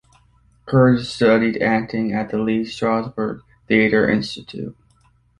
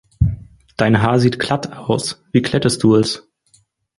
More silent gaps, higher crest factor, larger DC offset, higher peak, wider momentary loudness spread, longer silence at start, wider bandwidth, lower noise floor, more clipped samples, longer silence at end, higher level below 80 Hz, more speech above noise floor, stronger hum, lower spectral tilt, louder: neither; about the same, 18 dB vs 16 dB; neither; about the same, -2 dBFS vs -2 dBFS; first, 15 LU vs 8 LU; first, 0.65 s vs 0.2 s; about the same, 11 kHz vs 11.5 kHz; about the same, -58 dBFS vs -57 dBFS; neither; about the same, 0.7 s vs 0.8 s; second, -50 dBFS vs -34 dBFS; about the same, 39 dB vs 41 dB; neither; first, -7 dB/octave vs -5.5 dB/octave; about the same, -19 LUFS vs -17 LUFS